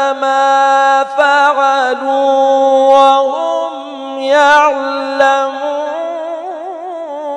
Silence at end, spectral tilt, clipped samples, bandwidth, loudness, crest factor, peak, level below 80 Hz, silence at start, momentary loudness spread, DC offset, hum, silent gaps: 0 s; -1 dB/octave; 0.3%; 10 kHz; -11 LUFS; 12 dB; 0 dBFS; -66 dBFS; 0 s; 15 LU; under 0.1%; none; none